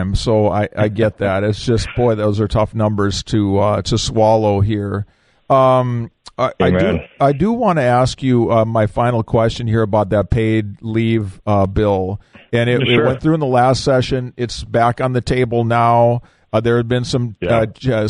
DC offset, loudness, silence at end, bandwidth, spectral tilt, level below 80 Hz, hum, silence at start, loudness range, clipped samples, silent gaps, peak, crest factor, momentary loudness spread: under 0.1%; -16 LUFS; 0 s; 10.5 kHz; -6.5 dB/octave; -36 dBFS; none; 0 s; 1 LU; under 0.1%; none; -2 dBFS; 14 dB; 7 LU